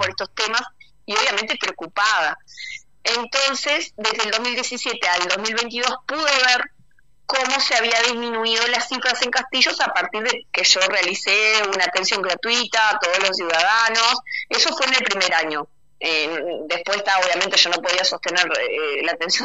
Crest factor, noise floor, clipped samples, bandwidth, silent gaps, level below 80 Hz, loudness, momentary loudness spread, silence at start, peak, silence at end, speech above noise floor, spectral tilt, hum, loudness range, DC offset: 20 dB; -59 dBFS; under 0.1%; 10.5 kHz; none; -66 dBFS; -19 LUFS; 8 LU; 0 s; 0 dBFS; 0 s; 39 dB; 0 dB/octave; none; 4 LU; 0.3%